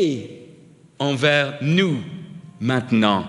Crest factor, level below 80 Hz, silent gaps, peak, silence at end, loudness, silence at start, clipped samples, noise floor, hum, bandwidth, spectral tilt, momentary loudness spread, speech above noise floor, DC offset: 18 dB; -64 dBFS; none; -2 dBFS; 0 s; -20 LUFS; 0 s; under 0.1%; -48 dBFS; none; 11.5 kHz; -6 dB/octave; 19 LU; 29 dB; under 0.1%